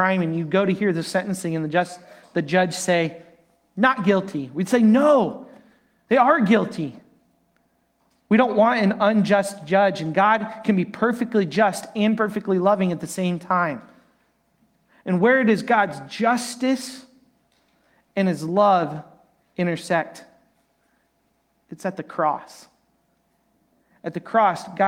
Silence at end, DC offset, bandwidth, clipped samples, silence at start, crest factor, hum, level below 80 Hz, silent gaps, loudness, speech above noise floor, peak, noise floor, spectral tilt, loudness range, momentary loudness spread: 0 s; under 0.1%; 15.5 kHz; under 0.1%; 0 s; 20 dB; none; -68 dBFS; none; -21 LUFS; 47 dB; -2 dBFS; -68 dBFS; -6 dB/octave; 9 LU; 14 LU